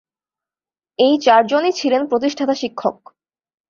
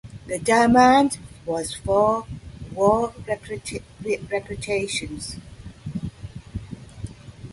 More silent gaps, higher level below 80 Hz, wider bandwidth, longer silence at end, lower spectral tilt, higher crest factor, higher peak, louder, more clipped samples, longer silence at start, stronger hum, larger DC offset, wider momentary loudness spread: neither; second, -68 dBFS vs -44 dBFS; second, 7.4 kHz vs 11.5 kHz; first, 0.8 s vs 0 s; about the same, -4 dB/octave vs -5 dB/octave; about the same, 16 dB vs 20 dB; about the same, -2 dBFS vs -2 dBFS; first, -17 LUFS vs -22 LUFS; neither; first, 1 s vs 0.05 s; neither; neither; second, 10 LU vs 22 LU